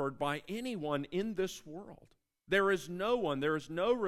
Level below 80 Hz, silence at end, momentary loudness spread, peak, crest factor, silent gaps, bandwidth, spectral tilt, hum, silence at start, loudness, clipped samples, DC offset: -64 dBFS; 0 s; 14 LU; -16 dBFS; 18 dB; none; 14.5 kHz; -5 dB/octave; none; 0 s; -34 LUFS; under 0.1%; under 0.1%